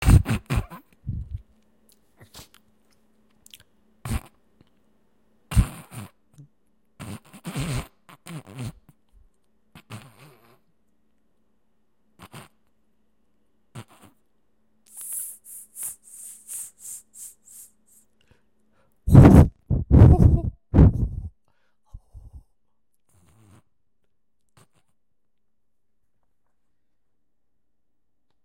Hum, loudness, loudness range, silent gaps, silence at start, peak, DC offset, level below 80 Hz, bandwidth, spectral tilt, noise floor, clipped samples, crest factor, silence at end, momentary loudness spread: none; -20 LUFS; 24 LU; none; 0 s; 0 dBFS; under 0.1%; -32 dBFS; 16.5 kHz; -7.5 dB/octave; -81 dBFS; under 0.1%; 24 dB; 7.15 s; 29 LU